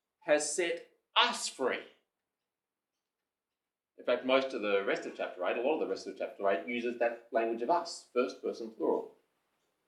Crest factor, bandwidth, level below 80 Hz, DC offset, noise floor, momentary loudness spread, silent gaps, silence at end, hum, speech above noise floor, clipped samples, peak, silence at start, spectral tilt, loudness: 24 dB; 13.5 kHz; under -90 dBFS; under 0.1%; under -90 dBFS; 10 LU; none; 0.75 s; none; over 57 dB; under 0.1%; -10 dBFS; 0.25 s; -2 dB/octave; -33 LUFS